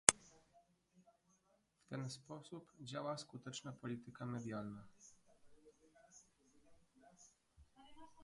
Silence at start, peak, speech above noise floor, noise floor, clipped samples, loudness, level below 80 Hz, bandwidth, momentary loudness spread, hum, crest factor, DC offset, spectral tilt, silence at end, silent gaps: 0.1 s; -2 dBFS; 30 dB; -79 dBFS; under 0.1%; -46 LUFS; -78 dBFS; 11.5 kHz; 20 LU; none; 46 dB; under 0.1%; -2.5 dB/octave; 0 s; none